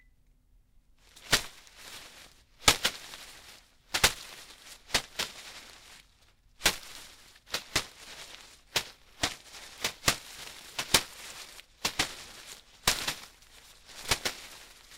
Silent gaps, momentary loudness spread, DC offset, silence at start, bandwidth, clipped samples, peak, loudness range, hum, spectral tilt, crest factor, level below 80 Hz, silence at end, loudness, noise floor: none; 23 LU; under 0.1%; 1.15 s; 17.5 kHz; under 0.1%; 0 dBFS; 5 LU; none; -0.5 dB/octave; 34 dB; -54 dBFS; 0 s; -30 LUFS; -63 dBFS